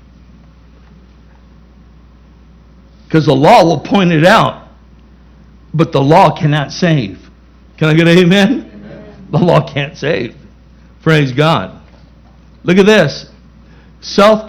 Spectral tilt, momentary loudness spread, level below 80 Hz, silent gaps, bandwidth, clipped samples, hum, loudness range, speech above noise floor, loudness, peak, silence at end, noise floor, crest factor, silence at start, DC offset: -6.5 dB/octave; 16 LU; -42 dBFS; none; 13.5 kHz; 0.8%; none; 4 LU; 32 dB; -11 LUFS; 0 dBFS; 0 s; -41 dBFS; 12 dB; 3.1 s; under 0.1%